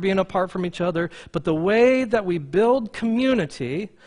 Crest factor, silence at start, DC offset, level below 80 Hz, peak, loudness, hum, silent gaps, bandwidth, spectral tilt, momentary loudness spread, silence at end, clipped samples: 16 dB; 0 s; under 0.1%; -52 dBFS; -6 dBFS; -22 LUFS; none; none; 10.5 kHz; -6.5 dB/octave; 10 LU; 0.2 s; under 0.1%